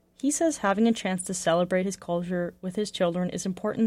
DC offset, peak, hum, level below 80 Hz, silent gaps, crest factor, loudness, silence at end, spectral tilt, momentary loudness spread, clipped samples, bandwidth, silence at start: under 0.1%; -12 dBFS; none; -60 dBFS; none; 16 dB; -27 LUFS; 0 s; -5 dB/octave; 7 LU; under 0.1%; 15.5 kHz; 0.25 s